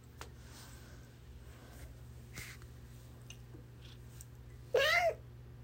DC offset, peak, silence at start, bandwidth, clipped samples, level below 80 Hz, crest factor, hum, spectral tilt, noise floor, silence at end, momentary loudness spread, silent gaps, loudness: under 0.1%; -18 dBFS; 0.15 s; 16 kHz; under 0.1%; -56 dBFS; 22 dB; none; -3 dB/octave; -54 dBFS; 0 s; 24 LU; none; -34 LUFS